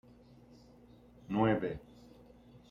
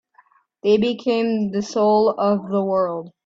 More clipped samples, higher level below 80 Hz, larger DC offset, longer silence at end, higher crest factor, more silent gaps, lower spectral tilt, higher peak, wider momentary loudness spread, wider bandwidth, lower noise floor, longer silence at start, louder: neither; about the same, -62 dBFS vs -64 dBFS; neither; about the same, 0.15 s vs 0.15 s; first, 22 dB vs 14 dB; neither; first, -8.5 dB/octave vs -6.5 dB/octave; second, -16 dBFS vs -6 dBFS; first, 27 LU vs 6 LU; about the same, 7.2 kHz vs 7.6 kHz; about the same, -59 dBFS vs -57 dBFS; first, 1.3 s vs 0.65 s; second, -34 LUFS vs -20 LUFS